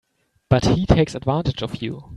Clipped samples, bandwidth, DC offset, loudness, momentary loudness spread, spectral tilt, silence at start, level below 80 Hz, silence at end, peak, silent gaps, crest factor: under 0.1%; 11 kHz; under 0.1%; -20 LUFS; 10 LU; -7 dB/octave; 0.5 s; -34 dBFS; 0 s; 0 dBFS; none; 20 dB